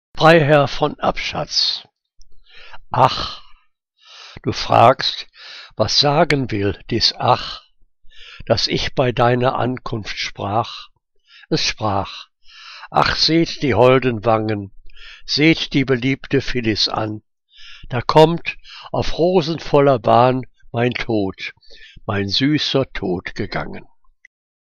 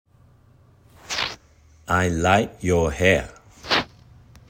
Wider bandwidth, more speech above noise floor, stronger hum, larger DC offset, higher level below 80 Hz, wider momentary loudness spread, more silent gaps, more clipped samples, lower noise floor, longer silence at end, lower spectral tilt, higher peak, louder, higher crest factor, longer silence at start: second, 10.5 kHz vs 16 kHz; first, 42 dB vs 34 dB; neither; neither; first, -38 dBFS vs -44 dBFS; second, 17 LU vs 21 LU; neither; neither; first, -59 dBFS vs -54 dBFS; first, 0.8 s vs 0.65 s; about the same, -5 dB/octave vs -4.5 dB/octave; about the same, 0 dBFS vs -2 dBFS; first, -17 LUFS vs -22 LUFS; about the same, 18 dB vs 22 dB; second, 0.15 s vs 1.1 s